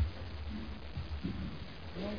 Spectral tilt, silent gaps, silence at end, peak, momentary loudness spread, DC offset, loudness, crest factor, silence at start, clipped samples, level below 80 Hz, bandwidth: -6 dB/octave; none; 0 s; -22 dBFS; 5 LU; 0.4%; -43 LUFS; 18 dB; 0 s; under 0.1%; -44 dBFS; 5.2 kHz